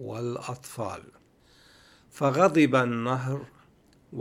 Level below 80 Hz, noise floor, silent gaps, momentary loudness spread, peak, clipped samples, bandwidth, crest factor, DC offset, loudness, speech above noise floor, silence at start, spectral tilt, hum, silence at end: -68 dBFS; -60 dBFS; none; 16 LU; -6 dBFS; under 0.1%; 15.5 kHz; 22 dB; under 0.1%; -26 LUFS; 34 dB; 0 s; -6.5 dB/octave; none; 0 s